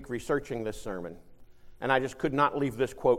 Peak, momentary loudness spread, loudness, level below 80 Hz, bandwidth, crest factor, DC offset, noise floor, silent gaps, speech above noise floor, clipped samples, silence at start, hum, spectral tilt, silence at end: -10 dBFS; 12 LU; -30 LUFS; -52 dBFS; 16 kHz; 20 dB; under 0.1%; -49 dBFS; none; 20 dB; under 0.1%; 0 s; none; -6 dB/octave; 0 s